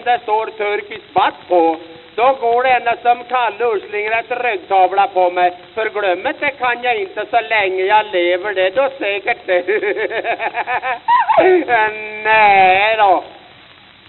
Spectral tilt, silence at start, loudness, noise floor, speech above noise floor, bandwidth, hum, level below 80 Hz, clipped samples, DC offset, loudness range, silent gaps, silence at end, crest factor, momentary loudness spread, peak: -0.5 dB/octave; 0 s; -15 LUFS; -43 dBFS; 28 dB; 4.3 kHz; none; -58 dBFS; under 0.1%; under 0.1%; 4 LU; none; 0.7 s; 16 dB; 8 LU; 0 dBFS